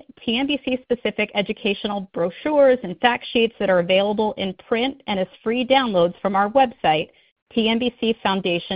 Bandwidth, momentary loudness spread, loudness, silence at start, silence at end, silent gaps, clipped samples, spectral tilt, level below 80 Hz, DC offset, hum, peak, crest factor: 5.2 kHz; 7 LU; -21 LUFS; 0.2 s; 0 s; 7.32-7.36 s, 7.42-7.46 s; under 0.1%; -9.5 dB/octave; -56 dBFS; under 0.1%; none; -2 dBFS; 20 dB